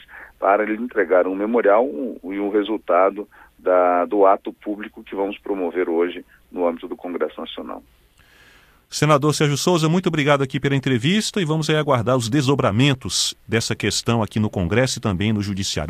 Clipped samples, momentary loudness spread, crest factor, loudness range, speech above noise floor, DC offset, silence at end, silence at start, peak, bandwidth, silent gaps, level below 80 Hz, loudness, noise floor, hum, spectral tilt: under 0.1%; 13 LU; 18 dB; 7 LU; 33 dB; under 0.1%; 0 s; 0.1 s; -2 dBFS; 15.5 kHz; none; -50 dBFS; -20 LUFS; -53 dBFS; none; -5 dB/octave